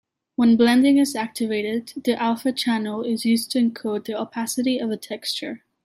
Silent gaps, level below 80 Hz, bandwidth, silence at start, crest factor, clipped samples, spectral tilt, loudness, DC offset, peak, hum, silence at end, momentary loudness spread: none; -66 dBFS; 15.5 kHz; 0.4 s; 16 dB; under 0.1%; -4 dB/octave; -22 LUFS; under 0.1%; -6 dBFS; none; 0.3 s; 12 LU